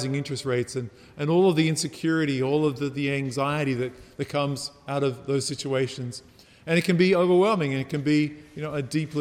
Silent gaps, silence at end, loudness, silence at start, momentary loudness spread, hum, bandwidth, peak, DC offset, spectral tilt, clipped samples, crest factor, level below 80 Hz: none; 0 s; -25 LUFS; 0 s; 13 LU; none; 15 kHz; -8 dBFS; under 0.1%; -5.5 dB/octave; under 0.1%; 18 dB; -62 dBFS